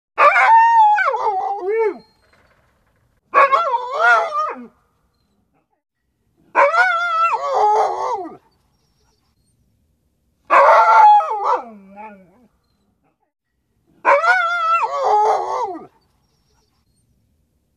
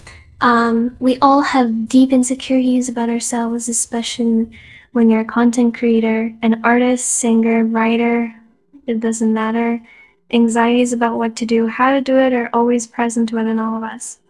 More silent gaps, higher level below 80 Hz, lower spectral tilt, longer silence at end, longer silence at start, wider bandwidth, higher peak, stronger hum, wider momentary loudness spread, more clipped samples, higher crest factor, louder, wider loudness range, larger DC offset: neither; second, -66 dBFS vs -54 dBFS; second, -2 dB/octave vs -4 dB/octave; first, 1.9 s vs 0.15 s; about the same, 0.15 s vs 0.05 s; second, 10 kHz vs 12 kHz; about the same, -2 dBFS vs 0 dBFS; neither; first, 13 LU vs 7 LU; neither; about the same, 16 dB vs 16 dB; about the same, -15 LUFS vs -16 LUFS; first, 6 LU vs 3 LU; neither